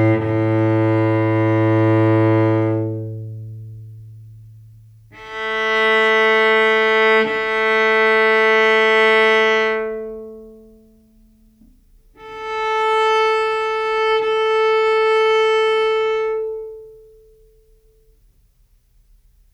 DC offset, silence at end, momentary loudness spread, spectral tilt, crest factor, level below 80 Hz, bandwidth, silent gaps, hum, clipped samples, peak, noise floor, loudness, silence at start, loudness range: under 0.1%; 2.6 s; 18 LU; -6.5 dB/octave; 14 dB; -54 dBFS; 10 kHz; none; 60 Hz at -70 dBFS; under 0.1%; -4 dBFS; -56 dBFS; -16 LUFS; 0 s; 11 LU